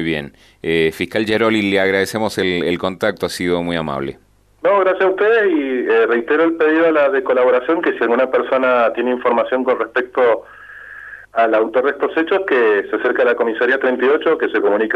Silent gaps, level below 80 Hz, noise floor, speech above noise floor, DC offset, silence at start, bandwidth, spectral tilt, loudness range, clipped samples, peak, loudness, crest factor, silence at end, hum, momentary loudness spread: none; -52 dBFS; -36 dBFS; 20 dB; under 0.1%; 0 s; 13.5 kHz; -5.5 dB/octave; 3 LU; under 0.1%; -2 dBFS; -16 LUFS; 14 dB; 0 s; none; 7 LU